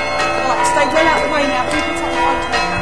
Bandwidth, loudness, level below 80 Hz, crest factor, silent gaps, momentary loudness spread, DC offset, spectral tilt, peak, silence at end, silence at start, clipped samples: 11 kHz; -15 LUFS; -36 dBFS; 14 dB; none; 4 LU; 3%; -3.5 dB/octave; -2 dBFS; 0 s; 0 s; under 0.1%